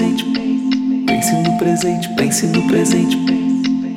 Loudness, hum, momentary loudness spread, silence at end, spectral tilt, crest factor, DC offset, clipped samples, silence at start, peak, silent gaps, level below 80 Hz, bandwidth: -16 LUFS; none; 4 LU; 0 s; -4.5 dB/octave; 12 dB; 0.1%; under 0.1%; 0 s; -4 dBFS; none; -52 dBFS; 16.5 kHz